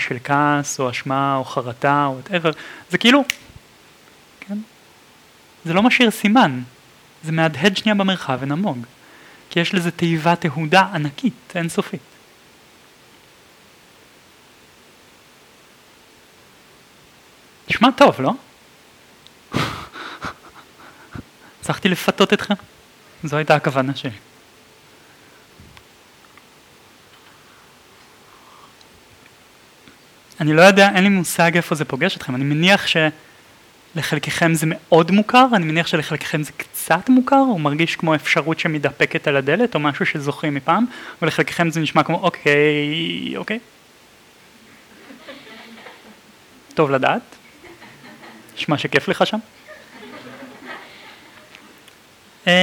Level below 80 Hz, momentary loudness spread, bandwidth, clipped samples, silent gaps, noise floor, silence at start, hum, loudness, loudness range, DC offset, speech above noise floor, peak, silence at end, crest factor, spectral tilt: -60 dBFS; 20 LU; 19.5 kHz; under 0.1%; none; -49 dBFS; 0 s; none; -18 LUFS; 10 LU; under 0.1%; 32 dB; 0 dBFS; 0 s; 20 dB; -5 dB/octave